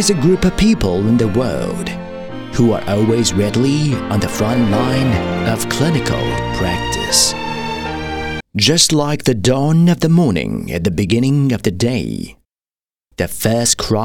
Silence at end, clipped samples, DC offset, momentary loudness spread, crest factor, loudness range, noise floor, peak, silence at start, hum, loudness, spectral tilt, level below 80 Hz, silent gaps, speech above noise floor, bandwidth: 0 s; under 0.1%; under 0.1%; 10 LU; 16 dB; 3 LU; under -90 dBFS; 0 dBFS; 0 s; none; -15 LUFS; -4.5 dB/octave; -34 dBFS; none; over 75 dB; 18 kHz